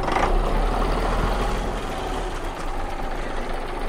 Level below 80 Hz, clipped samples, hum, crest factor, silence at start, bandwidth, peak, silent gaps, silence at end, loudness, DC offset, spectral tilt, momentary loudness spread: -26 dBFS; under 0.1%; none; 14 dB; 0 s; 15.5 kHz; -8 dBFS; none; 0 s; -26 LUFS; under 0.1%; -5.5 dB/octave; 8 LU